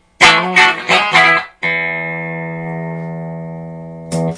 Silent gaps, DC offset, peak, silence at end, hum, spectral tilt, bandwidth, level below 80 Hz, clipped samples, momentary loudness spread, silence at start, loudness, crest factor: none; under 0.1%; 0 dBFS; 0 s; none; -3.5 dB/octave; 11 kHz; -50 dBFS; under 0.1%; 19 LU; 0.2 s; -12 LUFS; 16 dB